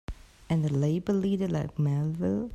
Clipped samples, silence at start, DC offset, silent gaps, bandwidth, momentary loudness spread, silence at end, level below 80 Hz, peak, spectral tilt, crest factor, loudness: under 0.1%; 0.1 s; under 0.1%; none; 9.2 kHz; 3 LU; 0 s; -50 dBFS; -16 dBFS; -8.5 dB/octave; 12 dB; -28 LUFS